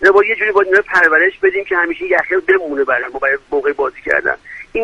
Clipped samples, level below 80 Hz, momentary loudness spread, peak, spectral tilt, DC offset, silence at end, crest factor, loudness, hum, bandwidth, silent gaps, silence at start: under 0.1%; -48 dBFS; 8 LU; 0 dBFS; -4.5 dB/octave; under 0.1%; 0 s; 14 dB; -14 LUFS; none; 8.4 kHz; none; 0 s